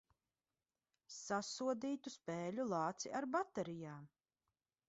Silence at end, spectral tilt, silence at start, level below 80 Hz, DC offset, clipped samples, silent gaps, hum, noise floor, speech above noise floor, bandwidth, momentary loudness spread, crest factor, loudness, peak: 0.8 s; -4.5 dB/octave; 1.1 s; -84 dBFS; under 0.1%; under 0.1%; none; none; under -90 dBFS; over 47 dB; 8 kHz; 12 LU; 20 dB; -43 LUFS; -26 dBFS